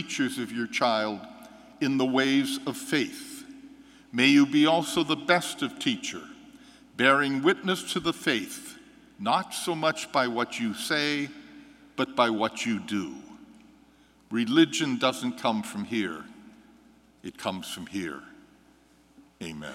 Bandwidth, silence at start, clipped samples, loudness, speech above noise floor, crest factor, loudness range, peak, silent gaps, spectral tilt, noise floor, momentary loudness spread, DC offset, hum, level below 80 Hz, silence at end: 16 kHz; 0 s; under 0.1%; -27 LUFS; 33 dB; 24 dB; 7 LU; -4 dBFS; none; -4 dB/octave; -59 dBFS; 19 LU; under 0.1%; none; -68 dBFS; 0 s